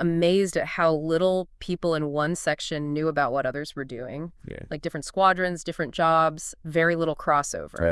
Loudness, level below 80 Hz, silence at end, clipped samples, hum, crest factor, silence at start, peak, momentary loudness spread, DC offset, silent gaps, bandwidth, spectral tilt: -25 LUFS; -50 dBFS; 0 s; under 0.1%; none; 18 dB; 0 s; -6 dBFS; 13 LU; under 0.1%; none; 12 kHz; -5 dB/octave